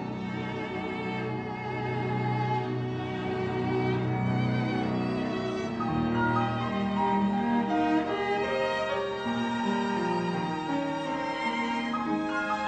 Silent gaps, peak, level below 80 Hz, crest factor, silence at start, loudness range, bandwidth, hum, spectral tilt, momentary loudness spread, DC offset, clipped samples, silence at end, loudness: none; -16 dBFS; -56 dBFS; 14 dB; 0 s; 3 LU; 9 kHz; none; -7 dB/octave; 6 LU; under 0.1%; under 0.1%; 0 s; -29 LUFS